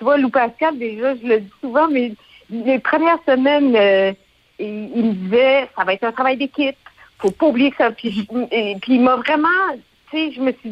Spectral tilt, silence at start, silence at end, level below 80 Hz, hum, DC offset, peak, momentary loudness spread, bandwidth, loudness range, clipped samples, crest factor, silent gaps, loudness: -6.5 dB/octave; 0 s; 0 s; -60 dBFS; none; under 0.1%; -4 dBFS; 10 LU; 7.6 kHz; 3 LU; under 0.1%; 12 dB; none; -17 LUFS